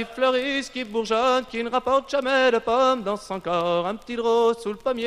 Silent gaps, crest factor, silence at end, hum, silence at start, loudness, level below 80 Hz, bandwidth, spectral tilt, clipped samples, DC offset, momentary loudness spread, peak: none; 16 dB; 0 s; none; 0 s; -23 LUFS; -56 dBFS; 12 kHz; -4 dB/octave; under 0.1%; under 0.1%; 8 LU; -6 dBFS